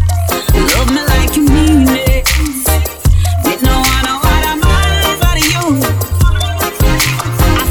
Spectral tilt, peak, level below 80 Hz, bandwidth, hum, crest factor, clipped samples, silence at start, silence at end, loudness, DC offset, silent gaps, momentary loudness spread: -4.5 dB/octave; 0 dBFS; -14 dBFS; over 20 kHz; none; 10 dB; under 0.1%; 0 s; 0 s; -12 LUFS; under 0.1%; none; 4 LU